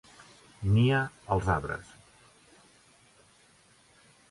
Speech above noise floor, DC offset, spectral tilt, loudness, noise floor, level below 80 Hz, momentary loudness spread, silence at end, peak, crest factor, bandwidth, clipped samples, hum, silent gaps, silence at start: 35 dB; under 0.1%; -7 dB/octave; -29 LUFS; -62 dBFS; -48 dBFS; 13 LU; 2.5 s; -14 dBFS; 18 dB; 11.5 kHz; under 0.1%; none; none; 0.6 s